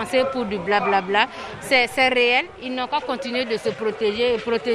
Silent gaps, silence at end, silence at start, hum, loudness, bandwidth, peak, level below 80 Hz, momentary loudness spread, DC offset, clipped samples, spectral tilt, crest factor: none; 0 s; 0 s; none; -21 LUFS; 13.5 kHz; -2 dBFS; -54 dBFS; 8 LU; under 0.1%; under 0.1%; -3.5 dB/octave; 20 dB